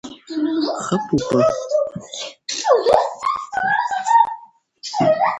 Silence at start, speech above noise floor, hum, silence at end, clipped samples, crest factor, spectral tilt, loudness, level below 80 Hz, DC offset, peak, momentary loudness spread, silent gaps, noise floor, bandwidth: 0.05 s; 25 dB; none; 0 s; under 0.1%; 18 dB; -4.5 dB/octave; -19 LUFS; -54 dBFS; under 0.1%; 0 dBFS; 13 LU; none; -43 dBFS; 11 kHz